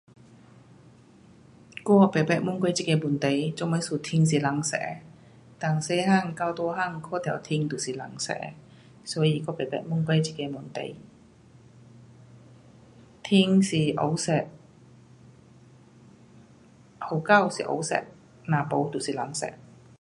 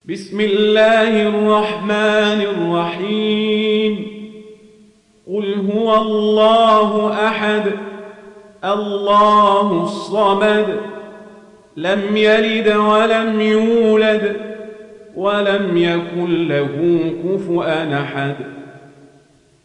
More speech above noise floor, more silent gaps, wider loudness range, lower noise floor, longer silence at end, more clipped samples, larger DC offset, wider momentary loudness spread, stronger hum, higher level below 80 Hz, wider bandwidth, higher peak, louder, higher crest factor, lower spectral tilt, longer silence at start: second, 29 dB vs 36 dB; neither; about the same, 6 LU vs 4 LU; about the same, -54 dBFS vs -51 dBFS; second, 0.45 s vs 0.85 s; neither; neither; about the same, 15 LU vs 15 LU; neither; second, -66 dBFS vs -58 dBFS; first, 11.5 kHz vs 9.8 kHz; about the same, -6 dBFS vs -4 dBFS; second, -26 LUFS vs -15 LUFS; first, 22 dB vs 12 dB; about the same, -5.5 dB/octave vs -6 dB/octave; first, 1.75 s vs 0.1 s